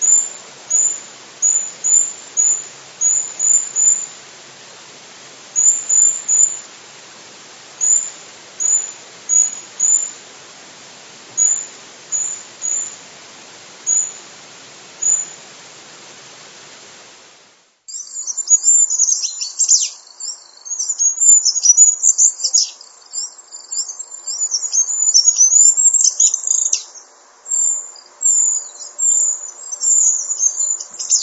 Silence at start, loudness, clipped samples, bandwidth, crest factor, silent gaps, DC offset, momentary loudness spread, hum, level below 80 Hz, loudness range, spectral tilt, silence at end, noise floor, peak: 0 s; -13 LUFS; under 0.1%; 8.2 kHz; 18 dB; none; under 0.1%; 18 LU; none; -86 dBFS; 10 LU; 3.5 dB/octave; 0 s; -51 dBFS; 0 dBFS